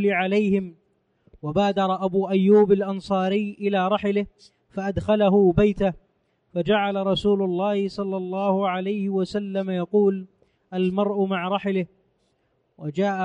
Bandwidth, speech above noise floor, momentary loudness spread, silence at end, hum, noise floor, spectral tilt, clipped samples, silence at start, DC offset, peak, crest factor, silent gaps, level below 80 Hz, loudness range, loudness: 8.6 kHz; 47 dB; 12 LU; 0 s; none; -69 dBFS; -8 dB/octave; under 0.1%; 0 s; under 0.1%; -6 dBFS; 16 dB; none; -50 dBFS; 3 LU; -23 LUFS